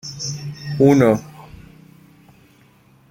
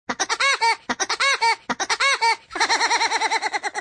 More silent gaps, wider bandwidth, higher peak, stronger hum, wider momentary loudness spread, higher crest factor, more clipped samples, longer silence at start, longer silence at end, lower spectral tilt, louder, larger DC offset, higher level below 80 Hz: neither; first, 16.5 kHz vs 10.5 kHz; first, -2 dBFS vs -6 dBFS; neither; first, 17 LU vs 6 LU; about the same, 20 dB vs 16 dB; neither; about the same, 0.05 s vs 0.1 s; first, 1.7 s vs 0 s; first, -6.5 dB/octave vs 1 dB/octave; first, -17 LUFS vs -20 LUFS; neither; first, -52 dBFS vs -64 dBFS